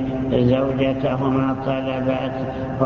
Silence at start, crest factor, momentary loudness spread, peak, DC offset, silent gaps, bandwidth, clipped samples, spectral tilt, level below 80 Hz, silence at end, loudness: 0 s; 16 dB; 7 LU; -4 dBFS; under 0.1%; none; 6.6 kHz; under 0.1%; -9 dB/octave; -40 dBFS; 0 s; -21 LUFS